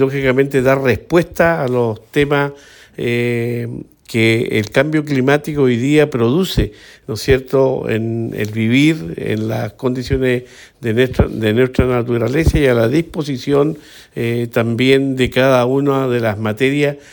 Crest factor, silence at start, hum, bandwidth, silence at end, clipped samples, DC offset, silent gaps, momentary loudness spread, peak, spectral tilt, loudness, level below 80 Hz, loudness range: 14 dB; 0 s; none; 19 kHz; 0.15 s; under 0.1%; under 0.1%; none; 9 LU; 0 dBFS; -6.5 dB/octave; -16 LUFS; -34 dBFS; 2 LU